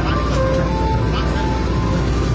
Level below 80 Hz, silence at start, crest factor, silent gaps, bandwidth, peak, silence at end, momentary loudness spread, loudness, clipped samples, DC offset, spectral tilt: -22 dBFS; 0 s; 12 dB; none; 8 kHz; -6 dBFS; 0 s; 2 LU; -19 LUFS; under 0.1%; under 0.1%; -7 dB/octave